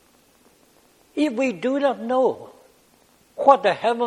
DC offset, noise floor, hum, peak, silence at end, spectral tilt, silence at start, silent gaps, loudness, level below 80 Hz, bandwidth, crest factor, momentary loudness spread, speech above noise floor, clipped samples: under 0.1%; -58 dBFS; none; -2 dBFS; 0 s; -5 dB/octave; 1.15 s; none; -21 LUFS; -70 dBFS; 12 kHz; 22 dB; 15 LU; 38 dB; under 0.1%